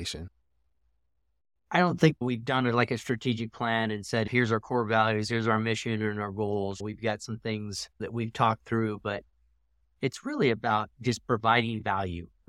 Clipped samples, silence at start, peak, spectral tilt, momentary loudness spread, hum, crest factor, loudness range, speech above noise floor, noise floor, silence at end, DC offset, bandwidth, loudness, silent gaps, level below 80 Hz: under 0.1%; 0 s; -8 dBFS; -5.5 dB/octave; 10 LU; none; 22 dB; 4 LU; 49 dB; -77 dBFS; 0.2 s; under 0.1%; 13 kHz; -29 LUFS; none; -60 dBFS